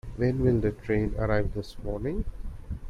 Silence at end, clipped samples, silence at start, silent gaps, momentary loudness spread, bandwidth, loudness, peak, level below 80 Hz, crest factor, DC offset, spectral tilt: 0 s; under 0.1%; 0.05 s; none; 13 LU; 11.5 kHz; -29 LUFS; -10 dBFS; -36 dBFS; 18 dB; under 0.1%; -9 dB/octave